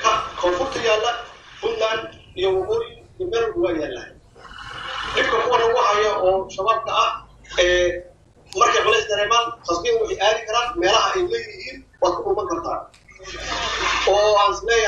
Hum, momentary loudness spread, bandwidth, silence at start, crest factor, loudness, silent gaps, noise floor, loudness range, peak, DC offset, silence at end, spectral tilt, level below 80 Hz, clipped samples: none; 15 LU; 9.6 kHz; 0 s; 18 dB; -20 LUFS; none; -48 dBFS; 5 LU; -2 dBFS; under 0.1%; 0 s; -2.5 dB/octave; -46 dBFS; under 0.1%